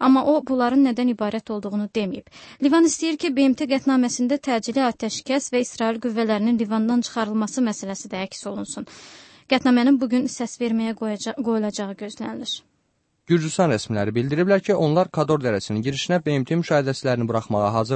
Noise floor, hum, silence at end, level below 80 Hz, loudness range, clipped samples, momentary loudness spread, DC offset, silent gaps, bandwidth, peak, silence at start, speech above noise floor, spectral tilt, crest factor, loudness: -69 dBFS; none; 0 s; -62 dBFS; 4 LU; under 0.1%; 12 LU; under 0.1%; none; 8.8 kHz; -6 dBFS; 0 s; 48 dB; -5.5 dB/octave; 16 dB; -22 LUFS